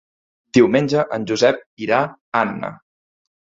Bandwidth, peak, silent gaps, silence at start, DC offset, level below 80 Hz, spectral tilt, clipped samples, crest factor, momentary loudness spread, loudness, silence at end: 7.8 kHz; 0 dBFS; 1.66-1.77 s, 2.21-2.32 s; 0.55 s; under 0.1%; -58 dBFS; -5.5 dB/octave; under 0.1%; 18 dB; 10 LU; -18 LUFS; 0.65 s